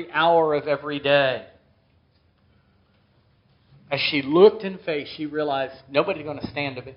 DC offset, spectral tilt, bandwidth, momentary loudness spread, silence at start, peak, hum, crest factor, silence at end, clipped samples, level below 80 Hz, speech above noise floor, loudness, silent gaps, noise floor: under 0.1%; -3 dB/octave; 5.6 kHz; 14 LU; 0 s; -2 dBFS; none; 22 dB; 0 s; under 0.1%; -64 dBFS; 40 dB; -22 LUFS; none; -62 dBFS